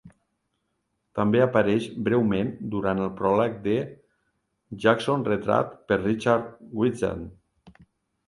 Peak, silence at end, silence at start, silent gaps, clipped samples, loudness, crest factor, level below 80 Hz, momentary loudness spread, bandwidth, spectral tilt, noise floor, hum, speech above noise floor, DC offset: -4 dBFS; 0.6 s; 0.05 s; none; under 0.1%; -25 LUFS; 22 dB; -54 dBFS; 9 LU; 11.5 kHz; -7 dB/octave; -76 dBFS; none; 52 dB; under 0.1%